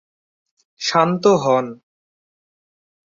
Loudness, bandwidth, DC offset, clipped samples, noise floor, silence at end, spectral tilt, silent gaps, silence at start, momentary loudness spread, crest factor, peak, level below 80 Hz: -17 LUFS; 7.6 kHz; under 0.1%; under 0.1%; under -90 dBFS; 1.3 s; -5 dB/octave; none; 0.8 s; 9 LU; 20 dB; -2 dBFS; -64 dBFS